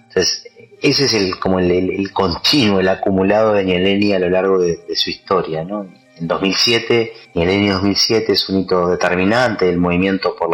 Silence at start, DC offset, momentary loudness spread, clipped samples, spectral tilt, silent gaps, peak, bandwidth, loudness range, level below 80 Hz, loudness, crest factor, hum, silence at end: 0.15 s; under 0.1%; 6 LU; under 0.1%; -4.5 dB/octave; none; -2 dBFS; 16 kHz; 2 LU; -46 dBFS; -15 LUFS; 14 dB; none; 0 s